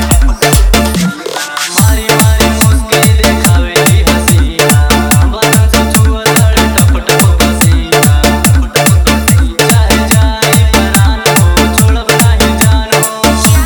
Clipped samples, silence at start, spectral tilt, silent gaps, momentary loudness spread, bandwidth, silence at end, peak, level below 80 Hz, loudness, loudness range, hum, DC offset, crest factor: 1%; 0 s; -4.5 dB/octave; none; 2 LU; over 20 kHz; 0 s; 0 dBFS; -12 dBFS; -8 LUFS; 1 LU; none; under 0.1%; 8 dB